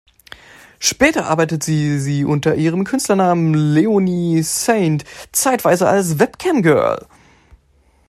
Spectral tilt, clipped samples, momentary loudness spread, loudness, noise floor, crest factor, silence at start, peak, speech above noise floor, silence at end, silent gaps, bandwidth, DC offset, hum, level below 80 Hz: -5 dB/octave; under 0.1%; 5 LU; -16 LUFS; -55 dBFS; 16 dB; 0.8 s; 0 dBFS; 40 dB; 1.1 s; none; 14.5 kHz; under 0.1%; none; -50 dBFS